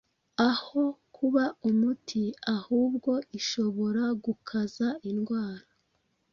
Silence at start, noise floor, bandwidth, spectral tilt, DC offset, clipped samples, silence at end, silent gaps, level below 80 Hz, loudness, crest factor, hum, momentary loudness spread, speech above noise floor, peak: 0.4 s; -74 dBFS; 7.2 kHz; -5 dB/octave; under 0.1%; under 0.1%; 0.75 s; none; -70 dBFS; -29 LUFS; 18 dB; none; 6 LU; 46 dB; -10 dBFS